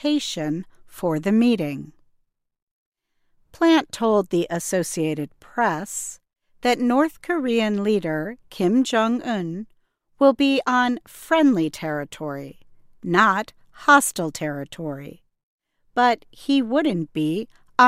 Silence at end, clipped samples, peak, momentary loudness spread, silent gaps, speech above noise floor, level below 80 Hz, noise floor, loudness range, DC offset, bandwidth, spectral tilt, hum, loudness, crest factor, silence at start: 0 s; under 0.1%; 0 dBFS; 14 LU; 2.62-2.92 s, 15.43-15.59 s; 46 dB; -60 dBFS; -68 dBFS; 3 LU; under 0.1%; 16 kHz; -4.5 dB/octave; none; -22 LUFS; 22 dB; 0 s